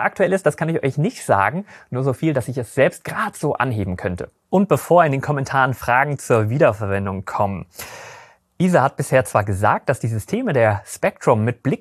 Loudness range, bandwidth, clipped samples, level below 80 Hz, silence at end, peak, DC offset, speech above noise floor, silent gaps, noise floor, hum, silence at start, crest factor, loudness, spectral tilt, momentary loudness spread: 3 LU; 14 kHz; under 0.1%; -52 dBFS; 0.05 s; -2 dBFS; under 0.1%; 26 dB; none; -45 dBFS; none; 0 s; 18 dB; -19 LUFS; -6.5 dB/octave; 8 LU